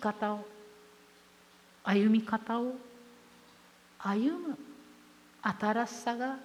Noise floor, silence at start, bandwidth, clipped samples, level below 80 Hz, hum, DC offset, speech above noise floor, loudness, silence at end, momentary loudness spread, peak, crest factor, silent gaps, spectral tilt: -60 dBFS; 0 s; 13 kHz; under 0.1%; -78 dBFS; 60 Hz at -60 dBFS; under 0.1%; 29 dB; -33 LUFS; 0 s; 23 LU; -16 dBFS; 18 dB; none; -6 dB/octave